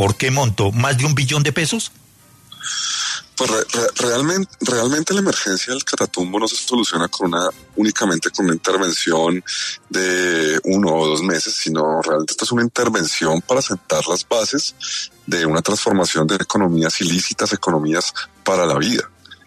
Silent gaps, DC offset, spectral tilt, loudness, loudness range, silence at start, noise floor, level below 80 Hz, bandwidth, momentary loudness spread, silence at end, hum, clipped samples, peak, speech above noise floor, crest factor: none; under 0.1%; -3.5 dB/octave; -18 LUFS; 2 LU; 0 s; -49 dBFS; -54 dBFS; 13.5 kHz; 5 LU; 0.15 s; none; under 0.1%; -4 dBFS; 30 dB; 16 dB